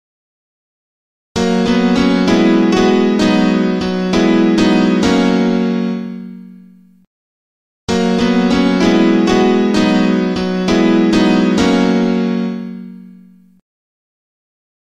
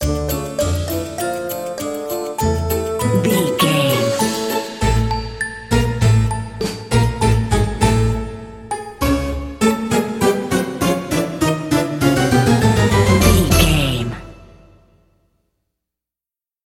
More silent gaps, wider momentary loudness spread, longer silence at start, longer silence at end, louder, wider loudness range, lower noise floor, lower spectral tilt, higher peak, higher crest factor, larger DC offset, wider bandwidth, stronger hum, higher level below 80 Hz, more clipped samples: first, 7.07-7.88 s vs none; about the same, 9 LU vs 11 LU; first, 1.35 s vs 0 s; second, 1.75 s vs 2.2 s; first, -13 LUFS vs -18 LUFS; about the same, 6 LU vs 4 LU; second, -43 dBFS vs under -90 dBFS; about the same, -6 dB/octave vs -5.5 dB/octave; about the same, -2 dBFS vs 0 dBFS; second, 12 dB vs 18 dB; neither; second, 10.5 kHz vs 17 kHz; neither; second, -42 dBFS vs -28 dBFS; neither